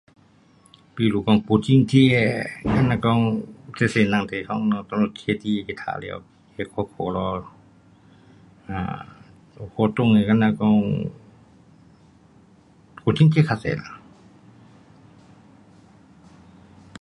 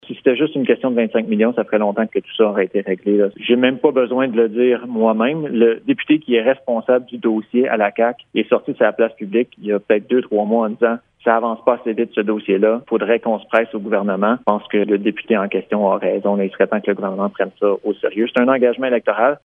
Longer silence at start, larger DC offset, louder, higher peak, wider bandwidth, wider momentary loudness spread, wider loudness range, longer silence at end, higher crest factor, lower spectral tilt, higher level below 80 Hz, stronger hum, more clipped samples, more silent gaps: first, 0.95 s vs 0.1 s; neither; second, -21 LUFS vs -18 LUFS; second, -4 dBFS vs 0 dBFS; first, 11.5 kHz vs 3.7 kHz; first, 17 LU vs 5 LU; first, 11 LU vs 2 LU; first, 3.05 s vs 0.1 s; about the same, 20 dB vs 16 dB; second, -7.5 dB/octave vs -9 dB/octave; first, -50 dBFS vs -70 dBFS; neither; neither; neither